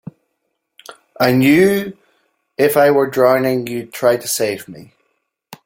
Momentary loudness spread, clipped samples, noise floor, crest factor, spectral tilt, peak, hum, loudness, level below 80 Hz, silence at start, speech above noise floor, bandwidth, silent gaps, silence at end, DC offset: 16 LU; under 0.1%; -72 dBFS; 16 dB; -5 dB/octave; 0 dBFS; none; -15 LUFS; -56 dBFS; 0.9 s; 58 dB; 17 kHz; none; 0.1 s; under 0.1%